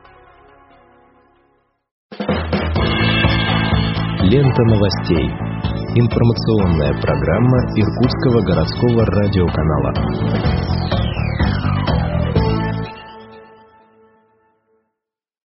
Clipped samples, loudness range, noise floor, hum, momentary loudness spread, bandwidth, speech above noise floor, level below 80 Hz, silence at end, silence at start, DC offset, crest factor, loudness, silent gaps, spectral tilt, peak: under 0.1%; 6 LU; -83 dBFS; none; 7 LU; 6 kHz; 69 dB; -28 dBFS; 2.05 s; 2.1 s; under 0.1%; 16 dB; -16 LUFS; none; -6 dB/octave; 0 dBFS